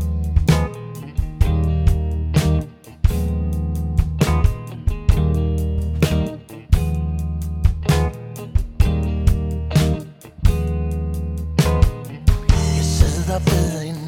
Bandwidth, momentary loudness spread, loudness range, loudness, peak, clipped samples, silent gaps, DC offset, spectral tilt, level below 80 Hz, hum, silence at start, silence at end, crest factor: 16 kHz; 8 LU; 2 LU; -20 LUFS; -2 dBFS; under 0.1%; none; under 0.1%; -6.5 dB/octave; -22 dBFS; none; 0 s; 0 s; 18 dB